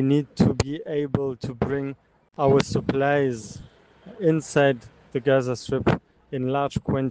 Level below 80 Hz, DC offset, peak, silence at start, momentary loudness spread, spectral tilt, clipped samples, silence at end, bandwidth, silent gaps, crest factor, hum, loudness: -48 dBFS; under 0.1%; -6 dBFS; 0 s; 13 LU; -6.5 dB/octave; under 0.1%; 0 s; 9.8 kHz; none; 18 dB; none; -24 LUFS